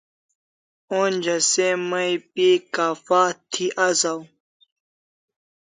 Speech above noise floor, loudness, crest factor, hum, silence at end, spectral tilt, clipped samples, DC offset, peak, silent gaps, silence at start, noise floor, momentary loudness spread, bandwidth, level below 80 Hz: over 69 dB; -21 LUFS; 18 dB; none; 1.4 s; -2.5 dB/octave; under 0.1%; under 0.1%; -4 dBFS; none; 0.9 s; under -90 dBFS; 6 LU; 9.6 kHz; -76 dBFS